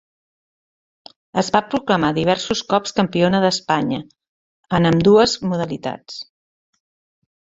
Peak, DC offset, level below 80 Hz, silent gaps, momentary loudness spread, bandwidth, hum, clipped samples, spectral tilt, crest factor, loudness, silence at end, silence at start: 0 dBFS; under 0.1%; -50 dBFS; 4.28-4.63 s; 14 LU; 8 kHz; none; under 0.1%; -5.5 dB/octave; 20 dB; -18 LUFS; 1.35 s; 1.35 s